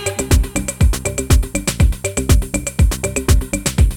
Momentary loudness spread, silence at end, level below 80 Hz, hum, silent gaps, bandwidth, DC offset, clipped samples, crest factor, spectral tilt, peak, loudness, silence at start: 4 LU; 0 s; -18 dBFS; none; none; 18 kHz; under 0.1%; under 0.1%; 14 dB; -4.5 dB/octave; 0 dBFS; -17 LUFS; 0 s